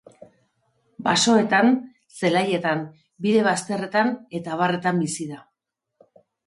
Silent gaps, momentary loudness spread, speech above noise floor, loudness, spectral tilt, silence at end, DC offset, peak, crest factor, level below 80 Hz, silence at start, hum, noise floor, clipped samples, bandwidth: none; 14 LU; 60 dB; -22 LUFS; -4.5 dB/octave; 1.1 s; under 0.1%; -6 dBFS; 18 dB; -68 dBFS; 1 s; none; -82 dBFS; under 0.1%; 11.5 kHz